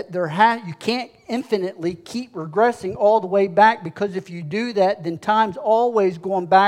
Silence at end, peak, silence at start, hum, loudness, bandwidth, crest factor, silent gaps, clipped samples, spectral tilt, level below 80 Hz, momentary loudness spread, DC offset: 0 s; 0 dBFS; 0 s; none; -20 LUFS; 13 kHz; 18 dB; none; under 0.1%; -6 dB/octave; -64 dBFS; 11 LU; under 0.1%